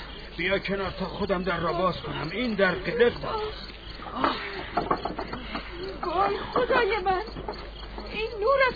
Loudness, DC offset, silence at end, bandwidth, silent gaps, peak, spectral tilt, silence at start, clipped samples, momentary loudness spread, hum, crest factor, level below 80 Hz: -28 LUFS; under 0.1%; 0 s; 5 kHz; none; -8 dBFS; -7 dB/octave; 0 s; under 0.1%; 13 LU; none; 18 dB; -44 dBFS